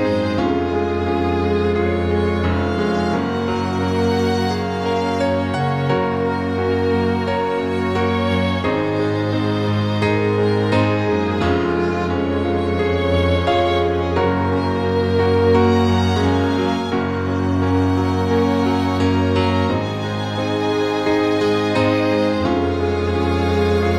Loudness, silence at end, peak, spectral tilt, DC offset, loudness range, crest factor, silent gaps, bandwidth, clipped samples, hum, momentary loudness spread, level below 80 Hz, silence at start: -18 LUFS; 0 s; -4 dBFS; -7 dB/octave; 0.3%; 2 LU; 14 dB; none; 11 kHz; under 0.1%; none; 4 LU; -38 dBFS; 0 s